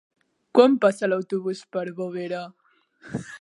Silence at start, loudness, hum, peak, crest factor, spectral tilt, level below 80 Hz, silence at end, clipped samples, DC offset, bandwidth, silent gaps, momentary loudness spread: 0.55 s; -23 LUFS; none; -2 dBFS; 22 dB; -6 dB/octave; -66 dBFS; 0.05 s; under 0.1%; under 0.1%; 11.5 kHz; none; 17 LU